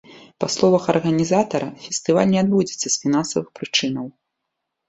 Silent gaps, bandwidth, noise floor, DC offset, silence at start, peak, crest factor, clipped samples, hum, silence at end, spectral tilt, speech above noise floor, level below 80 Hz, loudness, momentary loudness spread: none; 8.4 kHz; -79 dBFS; under 0.1%; 0.1 s; -2 dBFS; 20 dB; under 0.1%; none; 0.8 s; -4.5 dB/octave; 59 dB; -60 dBFS; -20 LUFS; 9 LU